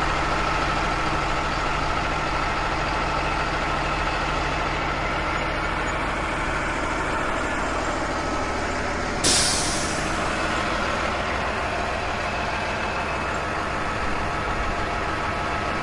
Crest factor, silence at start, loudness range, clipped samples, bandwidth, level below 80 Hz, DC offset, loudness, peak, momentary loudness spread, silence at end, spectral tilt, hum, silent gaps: 18 dB; 0 s; 3 LU; under 0.1%; 11.5 kHz; -34 dBFS; under 0.1%; -24 LUFS; -6 dBFS; 3 LU; 0 s; -3.5 dB/octave; none; none